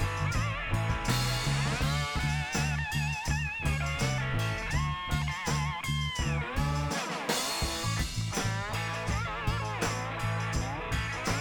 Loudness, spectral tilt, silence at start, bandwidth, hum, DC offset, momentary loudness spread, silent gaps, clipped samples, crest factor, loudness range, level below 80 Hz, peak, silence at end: -31 LUFS; -4 dB/octave; 0 s; over 20 kHz; none; under 0.1%; 3 LU; none; under 0.1%; 16 dB; 2 LU; -40 dBFS; -14 dBFS; 0 s